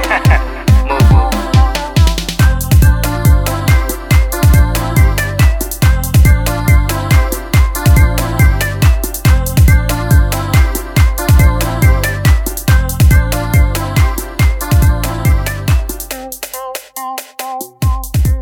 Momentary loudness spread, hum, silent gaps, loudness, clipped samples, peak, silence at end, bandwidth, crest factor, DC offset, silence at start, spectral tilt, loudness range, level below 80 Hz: 7 LU; none; none; -12 LUFS; under 0.1%; 0 dBFS; 0 s; 18.5 kHz; 10 dB; under 0.1%; 0 s; -5.5 dB/octave; 4 LU; -14 dBFS